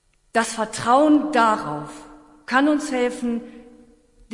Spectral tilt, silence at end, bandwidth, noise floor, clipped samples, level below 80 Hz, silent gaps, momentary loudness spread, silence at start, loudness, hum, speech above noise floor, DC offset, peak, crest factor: -4 dB/octave; 0 s; 11.5 kHz; -53 dBFS; under 0.1%; -56 dBFS; none; 15 LU; 0.35 s; -20 LUFS; none; 33 dB; under 0.1%; -4 dBFS; 18 dB